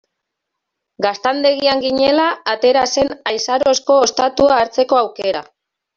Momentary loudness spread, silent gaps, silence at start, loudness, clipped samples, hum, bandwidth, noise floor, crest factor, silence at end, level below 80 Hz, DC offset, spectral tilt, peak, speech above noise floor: 7 LU; none; 1 s; -15 LUFS; under 0.1%; none; 7.6 kHz; -78 dBFS; 14 dB; 0.55 s; -52 dBFS; under 0.1%; -2.5 dB/octave; -2 dBFS; 63 dB